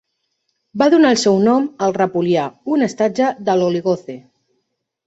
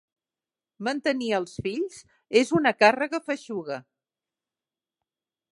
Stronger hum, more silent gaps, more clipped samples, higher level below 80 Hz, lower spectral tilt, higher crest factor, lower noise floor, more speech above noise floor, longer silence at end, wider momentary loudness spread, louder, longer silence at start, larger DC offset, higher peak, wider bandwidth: neither; neither; neither; about the same, -62 dBFS vs -64 dBFS; about the same, -5.5 dB/octave vs -4.5 dB/octave; second, 16 dB vs 22 dB; second, -72 dBFS vs under -90 dBFS; second, 57 dB vs over 65 dB; second, 0.9 s vs 1.7 s; second, 10 LU vs 13 LU; first, -16 LUFS vs -25 LUFS; about the same, 0.75 s vs 0.8 s; neither; about the same, -2 dBFS vs -4 dBFS; second, 8 kHz vs 11.5 kHz